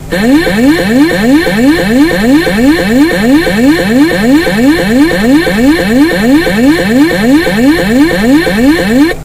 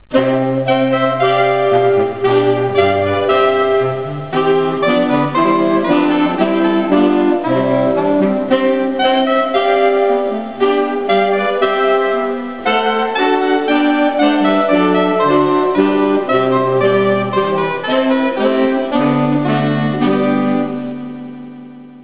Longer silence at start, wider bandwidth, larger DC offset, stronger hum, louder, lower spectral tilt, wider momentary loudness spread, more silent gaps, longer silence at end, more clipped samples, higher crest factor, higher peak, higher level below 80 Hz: about the same, 0 s vs 0.1 s; first, 16 kHz vs 4 kHz; second, 0.3% vs 0.9%; neither; first, -7 LUFS vs -14 LUFS; second, -5.5 dB/octave vs -10 dB/octave; second, 1 LU vs 4 LU; neither; about the same, 0 s vs 0 s; first, 2% vs under 0.1%; second, 6 dB vs 14 dB; about the same, 0 dBFS vs 0 dBFS; first, -26 dBFS vs -50 dBFS